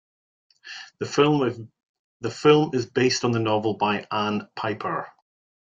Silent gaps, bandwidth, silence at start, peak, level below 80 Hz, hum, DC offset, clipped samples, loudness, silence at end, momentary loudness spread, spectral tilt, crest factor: 1.83-2.20 s; 7.8 kHz; 0.65 s; -4 dBFS; -66 dBFS; none; under 0.1%; under 0.1%; -23 LUFS; 0.6 s; 19 LU; -5.5 dB/octave; 20 dB